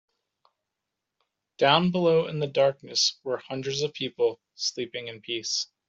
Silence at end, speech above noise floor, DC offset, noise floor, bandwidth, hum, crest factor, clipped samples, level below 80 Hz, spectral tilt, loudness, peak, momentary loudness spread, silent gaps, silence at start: 0.25 s; 59 dB; under 0.1%; -85 dBFS; 7.8 kHz; none; 22 dB; under 0.1%; -70 dBFS; -3.5 dB/octave; -26 LUFS; -6 dBFS; 12 LU; none; 1.6 s